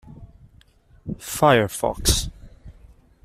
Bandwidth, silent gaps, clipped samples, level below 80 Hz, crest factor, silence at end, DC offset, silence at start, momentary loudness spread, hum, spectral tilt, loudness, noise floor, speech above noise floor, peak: 15.5 kHz; none; under 0.1%; -36 dBFS; 22 dB; 0.55 s; under 0.1%; 0.05 s; 18 LU; none; -3.5 dB/octave; -20 LUFS; -54 dBFS; 34 dB; -4 dBFS